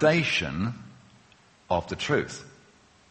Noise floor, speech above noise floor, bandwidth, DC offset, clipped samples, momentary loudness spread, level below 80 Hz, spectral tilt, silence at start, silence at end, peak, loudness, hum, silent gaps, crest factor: -58 dBFS; 32 dB; 8.4 kHz; under 0.1%; under 0.1%; 15 LU; -54 dBFS; -5 dB/octave; 0 s; 0.6 s; -6 dBFS; -27 LUFS; none; none; 22 dB